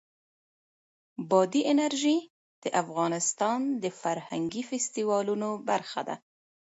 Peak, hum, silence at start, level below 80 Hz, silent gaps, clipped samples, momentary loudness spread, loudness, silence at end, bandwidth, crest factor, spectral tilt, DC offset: -10 dBFS; none; 1.2 s; -78 dBFS; 2.30-2.62 s; under 0.1%; 10 LU; -29 LUFS; 0.55 s; 8.2 kHz; 20 dB; -4 dB/octave; under 0.1%